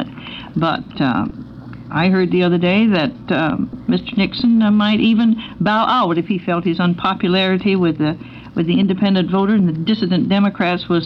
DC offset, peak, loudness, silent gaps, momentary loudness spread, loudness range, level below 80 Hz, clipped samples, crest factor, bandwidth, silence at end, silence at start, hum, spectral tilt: under 0.1%; -2 dBFS; -16 LUFS; none; 8 LU; 2 LU; -46 dBFS; under 0.1%; 14 dB; 5.8 kHz; 0 s; 0 s; none; -8.5 dB/octave